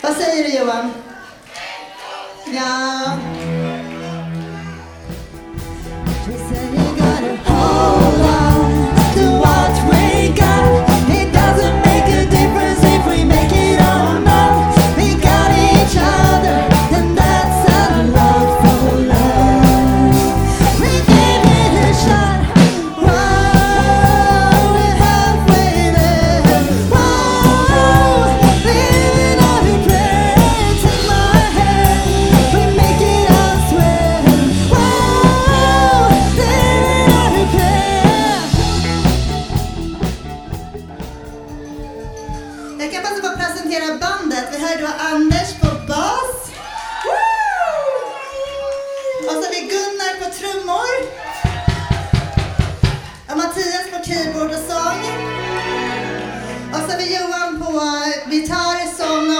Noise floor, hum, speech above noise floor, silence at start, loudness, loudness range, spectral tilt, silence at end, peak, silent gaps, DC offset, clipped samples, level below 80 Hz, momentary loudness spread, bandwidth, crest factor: -35 dBFS; none; 17 dB; 0 s; -13 LUFS; 11 LU; -5.5 dB/octave; 0 s; 0 dBFS; none; under 0.1%; under 0.1%; -22 dBFS; 15 LU; over 20 kHz; 14 dB